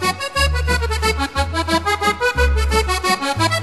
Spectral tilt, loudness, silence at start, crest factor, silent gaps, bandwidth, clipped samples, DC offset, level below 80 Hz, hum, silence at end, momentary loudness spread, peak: -4 dB/octave; -18 LUFS; 0 s; 14 dB; none; 13 kHz; under 0.1%; 0.4%; -24 dBFS; none; 0 s; 3 LU; -4 dBFS